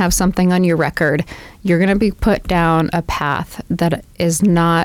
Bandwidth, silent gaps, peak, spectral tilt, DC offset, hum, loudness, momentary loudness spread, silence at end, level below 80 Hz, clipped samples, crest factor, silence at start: 16.5 kHz; none; -6 dBFS; -5.5 dB/octave; under 0.1%; none; -16 LUFS; 7 LU; 0 s; -32 dBFS; under 0.1%; 10 dB; 0 s